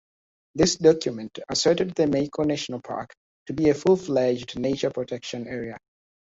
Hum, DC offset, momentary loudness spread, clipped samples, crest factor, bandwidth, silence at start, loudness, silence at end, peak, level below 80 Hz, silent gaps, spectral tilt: none; under 0.1%; 15 LU; under 0.1%; 20 dB; 8 kHz; 0.55 s; -24 LUFS; 0.55 s; -4 dBFS; -54 dBFS; 3.17-3.46 s; -5 dB/octave